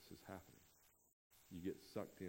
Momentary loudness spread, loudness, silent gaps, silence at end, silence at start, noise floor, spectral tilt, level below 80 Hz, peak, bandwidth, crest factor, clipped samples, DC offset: 15 LU; -53 LUFS; 1.13-1.30 s; 0 s; 0 s; -74 dBFS; -6 dB/octave; -78 dBFS; -32 dBFS; 16 kHz; 22 dB; under 0.1%; under 0.1%